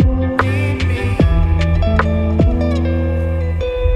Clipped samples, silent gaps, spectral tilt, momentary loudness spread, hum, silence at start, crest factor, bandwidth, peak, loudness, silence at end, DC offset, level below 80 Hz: under 0.1%; none; -8 dB/octave; 4 LU; none; 0 s; 12 dB; 9 kHz; -2 dBFS; -16 LUFS; 0 s; under 0.1%; -18 dBFS